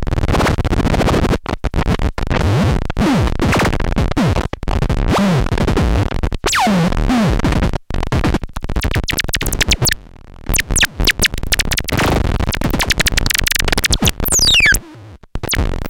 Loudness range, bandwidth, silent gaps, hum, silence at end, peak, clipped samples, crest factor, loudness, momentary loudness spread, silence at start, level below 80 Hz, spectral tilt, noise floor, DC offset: 3 LU; 17.5 kHz; none; none; 0 s; 0 dBFS; under 0.1%; 16 dB; -15 LUFS; 7 LU; 0 s; -20 dBFS; -4 dB/octave; -37 dBFS; under 0.1%